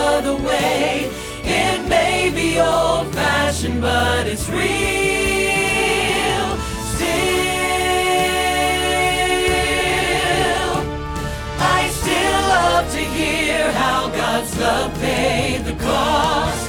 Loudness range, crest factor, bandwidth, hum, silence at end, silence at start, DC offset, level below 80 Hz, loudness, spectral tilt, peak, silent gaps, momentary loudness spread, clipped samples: 1 LU; 16 dB; 19 kHz; none; 0 s; 0 s; under 0.1%; -32 dBFS; -18 LUFS; -3.5 dB/octave; -2 dBFS; none; 5 LU; under 0.1%